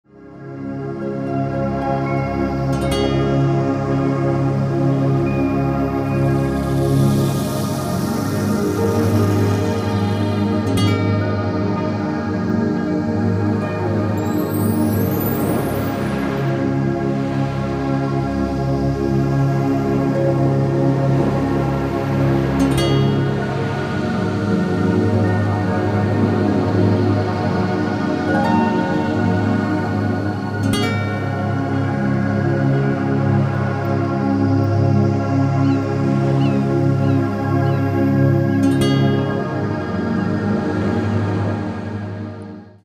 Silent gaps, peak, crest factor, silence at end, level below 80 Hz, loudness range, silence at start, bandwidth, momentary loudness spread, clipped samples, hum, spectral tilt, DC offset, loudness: none; -4 dBFS; 14 dB; 0.15 s; -38 dBFS; 2 LU; 0.15 s; 16 kHz; 5 LU; under 0.1%; none; -7.5 dB/octave; under 0.1%; -19 LUFS